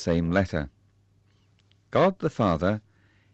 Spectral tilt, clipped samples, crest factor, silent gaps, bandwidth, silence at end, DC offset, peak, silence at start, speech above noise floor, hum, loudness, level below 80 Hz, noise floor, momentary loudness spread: -7.5 dB/octave; under 0.1%; 18 dB; none; 8 kHz; 0.55 s; under 0.1%; -10 dBFS; 0 s; 39 dB; none; -26 LUFS; -48 dBFS; -63 dBFS; 10 LU